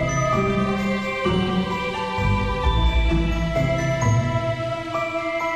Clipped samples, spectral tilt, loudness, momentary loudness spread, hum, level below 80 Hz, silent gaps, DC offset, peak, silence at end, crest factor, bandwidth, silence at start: under 0.1%; -6 dB/octave; -22 LUFS; 4 LU; none; -28 dBFS; none; under 0.1%; -8 dBFS; 0 s; 14 dB; 10.5 kHz; 0 s